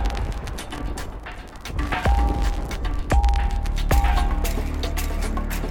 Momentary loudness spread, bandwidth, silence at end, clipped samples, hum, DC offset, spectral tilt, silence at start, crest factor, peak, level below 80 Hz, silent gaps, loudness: 11 LU; 17.5 kHz; 0 s; under 0.1%; none; 0.2%; -5.5 dB/octave; 0 s; 16 dB; -6 dBFS; -24 dBFS; none; -25 LUFS